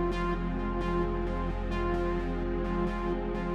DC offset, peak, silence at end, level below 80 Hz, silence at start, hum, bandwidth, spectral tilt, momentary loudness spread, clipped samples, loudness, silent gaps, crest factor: under 0.1%; -18 dBFS; 0 s; -34 dBFS; 0 s; none; 7.4 kHz; -8 dB/octave; 2 LU; under 0.1%; -32 LUFS; none; 12 dB